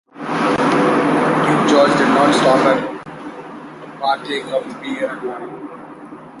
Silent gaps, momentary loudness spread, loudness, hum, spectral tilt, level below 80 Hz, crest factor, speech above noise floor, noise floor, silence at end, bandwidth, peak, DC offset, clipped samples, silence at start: none; 21 LU; -16 LUFS; none; -5 dB/octave; -58 dBFS; 16 dB; 18 dB; -36 dBFS; 0 s; 11.5 kHz; -2 dBFS; under 0.1%; under 0.1%; 0.15 s